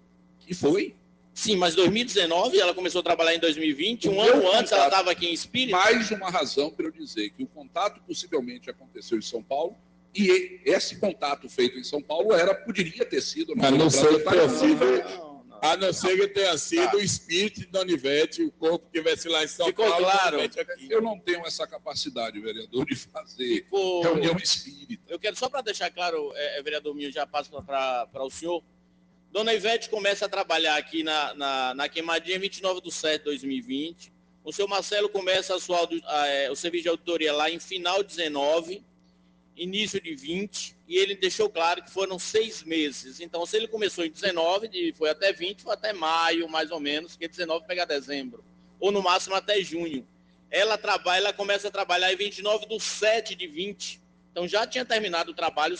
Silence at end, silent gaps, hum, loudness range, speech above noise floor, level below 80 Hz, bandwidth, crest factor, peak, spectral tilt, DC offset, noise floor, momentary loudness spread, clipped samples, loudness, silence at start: 0 s; none; none; 7 LU; 35 dB; -66 dBFS; 10 kHz; 18 dB; -8 dBFS; -3 dB/octave; under 0.1%; -61 dBFS; 12 LU; under 0.1%; -26 LUFS; 0.5 s